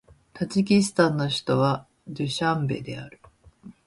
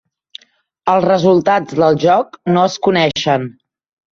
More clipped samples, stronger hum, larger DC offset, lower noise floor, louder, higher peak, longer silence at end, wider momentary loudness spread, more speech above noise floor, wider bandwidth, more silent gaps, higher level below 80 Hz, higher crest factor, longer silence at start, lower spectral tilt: neither; neither; neither; second, -49 dBFS vs -55 dBFS; second, -24 LUFS vs -14 LUFS; second, -6 dBFS vs -2 dBFS; second, 0.15 s vs 0.6 s; first, 16 LU vs 6 LU; second, 25 dB vs 41 dB; first, 11.5 kHz vs 7.4 kHz; neither; about the same, -58 dBFS vs -54 dBFS; first, 20 dB vs 14 dB; second, 0.35 s vs 0.85 s; about the same, -5.5 dB/octave vs -6 dB/octave